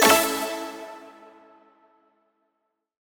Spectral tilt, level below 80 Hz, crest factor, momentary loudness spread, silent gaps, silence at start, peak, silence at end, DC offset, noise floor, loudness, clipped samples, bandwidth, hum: -1 dB/octave; -66 dBFS; 24 dB; 26 LU; none; 0 s; -4 dBFS; 2.05 s; under 0.1%; -78 dBFS; -23 LUFS; under 0.1%; over 20 kHz; none